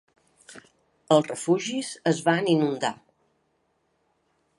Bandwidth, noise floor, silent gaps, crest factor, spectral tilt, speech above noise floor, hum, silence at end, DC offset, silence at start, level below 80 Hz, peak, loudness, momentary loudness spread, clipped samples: 11.5 kHz; -71 dBFS; none; 22 dB; -5 dB/octave; 48 dB; none; 1.65 s; under 0.1%; 0.5 s; -76 dBFS; -6 dBFS; -24 LUFS; 8 LU; under 0.1%